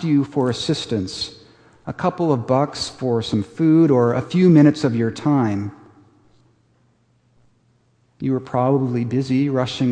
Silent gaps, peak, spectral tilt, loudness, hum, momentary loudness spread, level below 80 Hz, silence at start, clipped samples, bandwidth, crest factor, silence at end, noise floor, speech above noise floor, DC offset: none; -2 dBFS; -7 dB/octave; -19 LUFS; none; 12 LU; -56 dBFS; 0 s; under 0.1%; 9.8 kHz; 18 dB; 0 s; -60 dBFS; 42 dB; under 0.1%